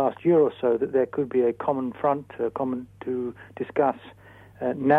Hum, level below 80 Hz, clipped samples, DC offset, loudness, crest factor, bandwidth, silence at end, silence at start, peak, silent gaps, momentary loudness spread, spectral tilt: none; -64 dBFS; under 0.1%; under 0.1%; -26 LUFS; 18 dB; 4 kHz; 0 s; 0 s; -6 dBFS; none; 11 LU; -9.5 dB/octave